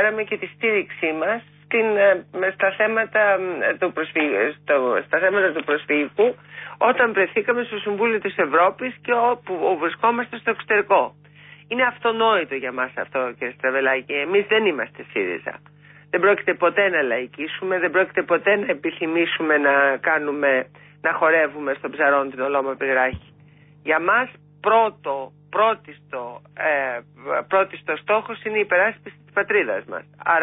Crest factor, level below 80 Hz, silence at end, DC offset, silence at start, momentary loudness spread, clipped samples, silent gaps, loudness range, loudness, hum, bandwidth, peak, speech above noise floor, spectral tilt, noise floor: 16 dB; -60 dBFS; 0 s; under 0.1%; 0 s; 10 LU; under 0.1%; none; 3 LU; -21 LUFS; 50 Hz at -50 dBFS; 3.9 kHz; -6 dBFS; 29 dB; -9 dB/octave; -50 dBFS